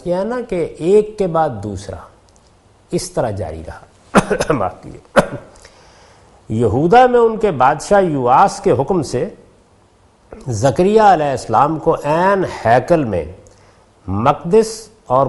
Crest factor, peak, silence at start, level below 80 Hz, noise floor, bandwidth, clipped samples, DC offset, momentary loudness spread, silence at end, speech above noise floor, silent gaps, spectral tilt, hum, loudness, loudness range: 16 dB; 0 dBFS; 0.05 s; -42 dBFS; -51 dBFS; 11.5 kHz; under 0.1%; under 0.1%; 16 LU; 0 s; 36 dB; none; -6 dB/octave; none; -15 LUFS; 7 LU